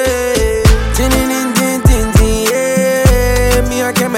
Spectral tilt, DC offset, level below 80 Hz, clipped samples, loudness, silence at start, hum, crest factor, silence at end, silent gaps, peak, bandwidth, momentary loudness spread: -5 dB/octave; under 0.1%; -16 dBFS; under 0.1%; -12 LUFS; 0 s; none; 10 dB; 0 s; none; 0 dBFS; 17 kHz; 3 LU